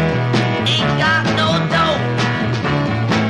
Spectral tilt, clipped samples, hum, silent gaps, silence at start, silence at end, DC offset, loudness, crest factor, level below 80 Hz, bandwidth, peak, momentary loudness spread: -5.5 dB/octave; under 0.1%; none; none; 0 s; 0 s; under 0.1%; -16 LUFS; 12 dB; -40 dBFS; 11 kHz; -4 dBFS; 3 LU